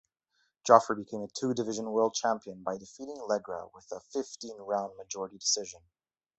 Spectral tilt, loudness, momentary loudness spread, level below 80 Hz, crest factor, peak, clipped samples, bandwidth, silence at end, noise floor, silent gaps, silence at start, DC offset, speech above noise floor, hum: -3 dB/octave; -31 LUFS; 19 LU; -74 dBFS; 28 dB; -4 dBFS; under 0.1%; 8.4 kHz; 0.6 s; -76 dBFS; none; 0.65 s; under 0.1%; 45 dB; none